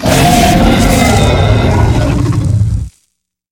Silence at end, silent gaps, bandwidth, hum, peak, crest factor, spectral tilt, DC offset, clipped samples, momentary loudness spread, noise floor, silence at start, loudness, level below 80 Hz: 0.6 s; none; 19 kHz; none; 0 dBFS; 10 dB; -5.5 dB/octave; under 0.1%; 0.3%; 6 LU; -64 dBFS; 0 s; -10 LUFS; -18 dBFS